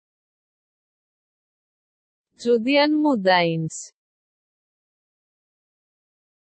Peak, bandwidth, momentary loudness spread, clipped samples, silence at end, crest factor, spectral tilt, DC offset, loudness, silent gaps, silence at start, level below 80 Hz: -6 dBFS; 8.4 kHz; 12 LU; under 0.1%; 2.55 s; 20 dB; -5 dB/octave; under 0.1%; -20 LUFS; none; 2.4 s; -78 dBFS